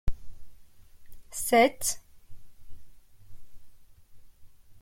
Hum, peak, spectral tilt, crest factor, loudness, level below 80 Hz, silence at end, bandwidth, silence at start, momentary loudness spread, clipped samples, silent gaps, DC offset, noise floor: none; -10 dBFS; -3 dB/octave; 20 dB; -26 LUFS; -44 dBFS; 0 s; 16.5 kHz; 0.05 s; 18 LU; under 0.1%; none; under 0.1%; -50 dBFS